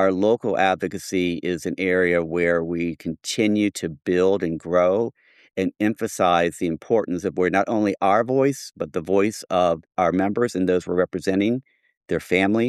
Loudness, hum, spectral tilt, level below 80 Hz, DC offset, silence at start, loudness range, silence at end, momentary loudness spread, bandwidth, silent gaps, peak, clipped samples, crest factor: -22 LUFS; none; -5.5 dB/octave; -56 dBFS; under 0.1%; 0 s; 1 LU; 0 s; 8 LU; 14 kHz; 11.97-12.01 s; -4 dBFS; under 0.1%; 16 dB